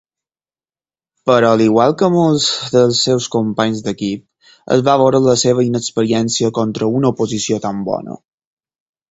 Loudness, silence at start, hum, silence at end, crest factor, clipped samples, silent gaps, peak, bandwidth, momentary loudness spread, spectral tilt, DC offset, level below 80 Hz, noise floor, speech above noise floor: -15 LUFS; 1.25 s; none; 0.95 s; 16 dB; under 0.1%; none; 0 dBFS; 8.2 kHz; 10 LU; -5 dB/octave; under 0.1%; -54 dBFS; under -90 dBFS; over 76 dB